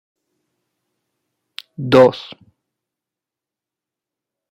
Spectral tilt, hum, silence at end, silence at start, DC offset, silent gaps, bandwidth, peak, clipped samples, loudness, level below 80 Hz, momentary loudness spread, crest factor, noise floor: -7 dB/octave; none; 2.3 s; 1.8 s; under 0.1%; none; 10 kHz; -2 dBFS; under 0.1%; -13 LUFS; -60 dBFS; 25 LU; 20 dB; -87 dBFS